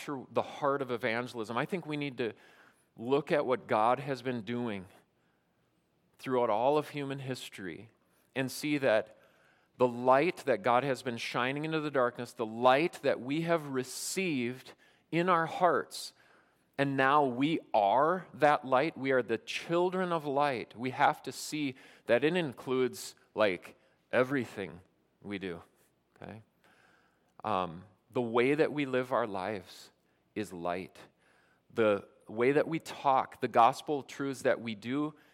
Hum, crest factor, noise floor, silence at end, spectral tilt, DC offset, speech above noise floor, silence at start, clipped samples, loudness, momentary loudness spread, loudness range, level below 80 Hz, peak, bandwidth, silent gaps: none; 20 dB; -74 dBFS; 0.2 s; -5 dB/octave; under 0.1%; 42 dB; 0 s; under 0.1%; -31 LUFS; 15 LU; 6 LU; -80 dBFS; -12 dBFS; 16.5 kHz; none